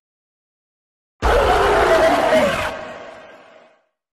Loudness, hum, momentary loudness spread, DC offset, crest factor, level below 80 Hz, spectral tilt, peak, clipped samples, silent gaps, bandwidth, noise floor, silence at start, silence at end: -16 LUFS; none; 19 LU; under 0.1%; 14 dB; -32 dBFS; -4.5 dB/octave; -4 dBFS; under 0.1%; none; 13.5 kHz; -55 dBFS; 1.2 s; 0.95 s